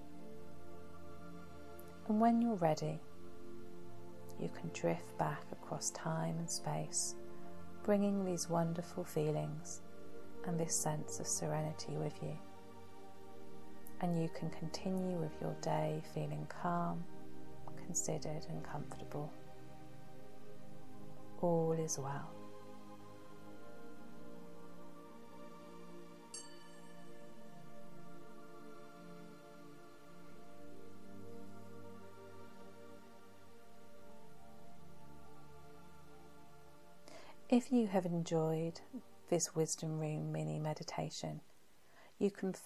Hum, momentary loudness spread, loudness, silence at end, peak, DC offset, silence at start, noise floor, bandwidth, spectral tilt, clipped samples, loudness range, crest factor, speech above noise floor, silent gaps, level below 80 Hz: none; 22 LU; -39 LUFS; 0 s; -20 dBFS; 0.4%; 0 s; -68 dBFS; 15 kHz; -5.5 dB/octave; under 0.1%; 18 LU; 22 dB; 30 dB; none; -72 dBFS